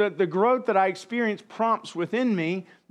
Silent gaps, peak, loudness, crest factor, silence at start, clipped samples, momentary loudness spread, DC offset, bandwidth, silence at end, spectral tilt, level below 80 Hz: none; -8 dBFS; -25 LUFS; 16 dB; 0 s; under 0.1%; 7 LU; under 0.1%; 11 kHz; 0.25 s; -6.5 dB/octave; -84 dBFS